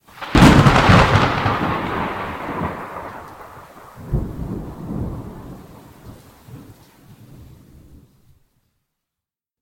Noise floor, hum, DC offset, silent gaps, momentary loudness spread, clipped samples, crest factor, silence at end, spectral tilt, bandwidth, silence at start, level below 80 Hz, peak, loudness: -87 dBFS; none; under 0.1%; none; 26 LU; under 0.1%; 20 dB; 3 s; -6 dB/octave; 16.5 kHz; 0.15 s; -32 dBFS; 0 dBFS; -17 LUFS